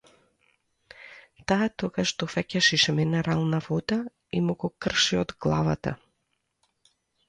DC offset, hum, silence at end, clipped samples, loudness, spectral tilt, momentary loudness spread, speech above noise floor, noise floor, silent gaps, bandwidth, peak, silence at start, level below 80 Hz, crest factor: under 0.1%; none; 1.35 s; under 0.1%; -26 LUFS; -4.5 dB/octave; 13 LU; 51 dB; -77 dBFS; none; 10 kHz; -8 dBFS; 1 s; -54 dBFS; 20 dB